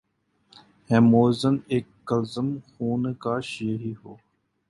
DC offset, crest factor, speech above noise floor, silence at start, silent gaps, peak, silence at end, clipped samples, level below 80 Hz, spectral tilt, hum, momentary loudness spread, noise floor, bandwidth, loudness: under 0.1%; 20 dB; 42 dB; 0.9 s; none; -6 dBFS; 0.55 s; under 0.1%; -60 dBFS; -7.5 dB/octave; none; 13 LU; -65 dBFS; 11.5 kHz; -24 LUFS